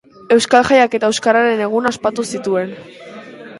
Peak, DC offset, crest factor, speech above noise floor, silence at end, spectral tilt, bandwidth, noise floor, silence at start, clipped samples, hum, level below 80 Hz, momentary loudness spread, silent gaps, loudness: 0 dBFS; under 0.1%; 16 dB; 20 dB; 0 s; -3.5 dB/octave; 11.5 kHz; -34 dBFS; 0.3 s; under 0.1%; none; -54 dBFS; 23 LU; none; -15 LUFS